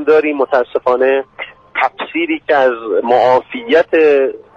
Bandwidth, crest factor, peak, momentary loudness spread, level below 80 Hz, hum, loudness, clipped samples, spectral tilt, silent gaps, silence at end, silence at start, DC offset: 6.6 kHz; 12 dB; 0 dBFS; 7 LU; -56 dBFS; none; -13 LUFS; under 0.1%; -5.5 dB/octave; none; 0.15 s; 0 s; under 0.1%